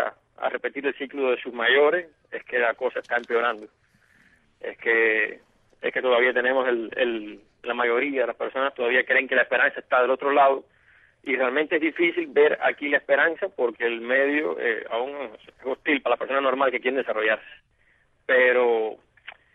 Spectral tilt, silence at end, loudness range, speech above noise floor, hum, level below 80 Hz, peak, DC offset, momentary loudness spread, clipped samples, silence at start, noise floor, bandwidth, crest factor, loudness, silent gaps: -5.5 dB/octave; 0.25 s; 3 LU; 40 dB; none; -70 dBFS; -8 dBFS; under 0.1%; 12 LU; under 0.1%; 0 s; -63 dBFS; 4.1 kHz; 16 dB; -23 LUFS; none